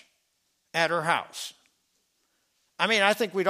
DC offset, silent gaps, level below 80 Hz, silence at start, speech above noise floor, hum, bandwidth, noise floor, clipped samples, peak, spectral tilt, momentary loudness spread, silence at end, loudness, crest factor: under 0.1%; none; -82 dBFS; 0.75 s; 48 dB; none; 15.5 kHz; -74 dBFS; under 0.1%; -6 dBFS; -3 dB/octave; 15 LU; 0 s; -25 LUFS; 24 dB